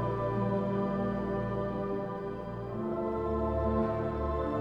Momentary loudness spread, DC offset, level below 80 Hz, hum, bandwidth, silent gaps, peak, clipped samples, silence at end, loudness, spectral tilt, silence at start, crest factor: 7 LU; under 0.1%; -44 dBFS; none; 7 kHz; none; -18 dBFS; under 0.1%; 0 s; -33 LUFS; -10 dB/octave; 0 s; 14 dB